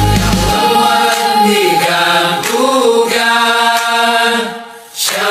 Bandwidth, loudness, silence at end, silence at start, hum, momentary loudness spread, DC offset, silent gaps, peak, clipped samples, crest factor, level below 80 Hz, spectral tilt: 15.5 kHz; -11 LUFS; 0 s; 0 s; none; 5 LU; under 0.1%; none; 0 dBFS; under 0.1%; 10 dB; -28 dBFS; -3 dB/octave